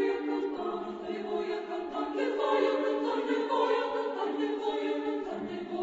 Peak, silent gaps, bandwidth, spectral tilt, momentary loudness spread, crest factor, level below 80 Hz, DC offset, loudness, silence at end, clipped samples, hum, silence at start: -16 dBFS; none; 8 kHz; -5 dB/octave; 8 LU; 16 dB; -70 dBFS; under 0.1%; -32 LUFS; 0 s; under 0.1%; none; 0 s